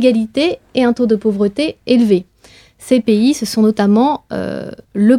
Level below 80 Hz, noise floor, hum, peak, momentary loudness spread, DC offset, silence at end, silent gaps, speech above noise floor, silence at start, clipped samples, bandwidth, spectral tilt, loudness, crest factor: -52 dBFS; -46 dBFS; none; 0 dBFS; 10 LU; under 0.1%; 0 s; none; 32 dB; 0 s; under 0.1%; 14.5 kHz; -6 dB/octave; -15 LUFS; 14 dB